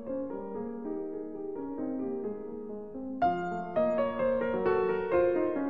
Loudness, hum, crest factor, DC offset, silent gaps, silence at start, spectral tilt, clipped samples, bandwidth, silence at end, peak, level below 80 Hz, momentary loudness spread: -32 LUFS; none; 14 dB; 0.3%; none; 0 s; -9 dB/octave; under 0.1%; 7.2 kHz; 0 s; -16 dBFS; -60 dBFS; 12 LU